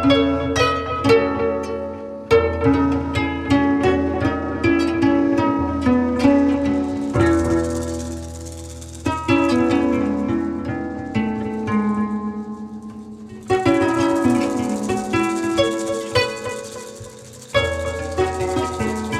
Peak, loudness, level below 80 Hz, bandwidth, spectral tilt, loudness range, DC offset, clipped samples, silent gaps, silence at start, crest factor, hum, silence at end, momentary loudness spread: -2 dBFS; -20 LUFS; -42 dBFS; 13 kHz; -6 dB/octave; 4 LU; under 0.1%; under 0.1%; none; 0 s; 16 dB; none; 0 s; 15 LU